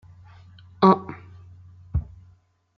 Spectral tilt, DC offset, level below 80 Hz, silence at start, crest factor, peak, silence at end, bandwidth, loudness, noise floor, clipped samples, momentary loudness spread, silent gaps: -9 dB/octave; under 0.1%; -42 dBFS; 0.8 s; 24 dB; -2 dBFS; 0.75 s; 6 kHz; -22 LUFS; -58 dBFS; under 0.1%; 24 LU; none